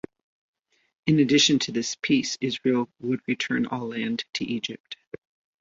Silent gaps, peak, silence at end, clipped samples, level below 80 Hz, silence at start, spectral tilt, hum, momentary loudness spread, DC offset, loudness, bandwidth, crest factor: 4.80-4.84 s, 5.07-5.11 s; -8 dBFS; 0.45 s; under 0.1%; -64 dBFS; 1.05 s; -4 dB/octave; none; 21 LU; under 0.1%; -25 LUFS; 7.8 kHz; 18 dB